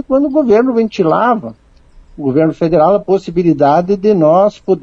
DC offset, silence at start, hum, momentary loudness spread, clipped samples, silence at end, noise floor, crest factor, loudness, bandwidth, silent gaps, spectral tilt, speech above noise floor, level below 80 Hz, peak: under 0.1%; 0.1 s; none; 5 LU; under 0.1%; 0 s; -42 dBFS; 12 dB; -12 LUFS; 7.6 kHz; none; -8.5 dB/octave; 31 dB; -44 dBFS; 0 dBFS